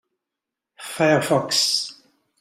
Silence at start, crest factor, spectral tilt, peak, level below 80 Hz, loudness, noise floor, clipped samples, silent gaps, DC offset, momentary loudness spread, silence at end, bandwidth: 0.8 s; 20 dB; -3 dB/octave; -4 dBFS; -64 dBFS; -19 LUFS; -85 dBFS; under 0.1%; none; under 0.1%; 16 LU; 0.5 s; 16 kHz